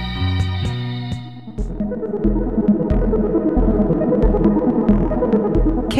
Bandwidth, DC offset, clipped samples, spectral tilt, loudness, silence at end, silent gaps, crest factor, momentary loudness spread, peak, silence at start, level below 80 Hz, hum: 10.5 kHz; 0.6%; under 0.1%; -8.5 dB/octave; -18 LUFS; 0 s; none; 16 dB; 10 LU; -2 dBFS; 0 s; -24 dBFS; none